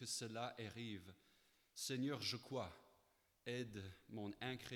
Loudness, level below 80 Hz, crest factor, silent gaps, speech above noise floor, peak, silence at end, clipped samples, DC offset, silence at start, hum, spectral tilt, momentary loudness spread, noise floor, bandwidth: -48 LUFS; -78 dBFS; 18 dB; none; 31 dB; -32 dBFS; 0 s; under 0.1%; under 0.1%; 0 s; none; -4 dB/octave; 12 LU; -79 dBFS; 19 kHz